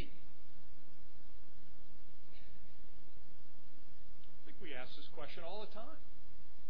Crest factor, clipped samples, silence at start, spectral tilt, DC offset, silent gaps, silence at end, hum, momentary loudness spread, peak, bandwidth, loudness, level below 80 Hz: 20 dB; under 0.1%; 0 s; -7 dB/octave; 4%; none; 0 s; none; 17 LU; -24 dBFS; 5.4 kHz; -56 LUFS; -64 dBFS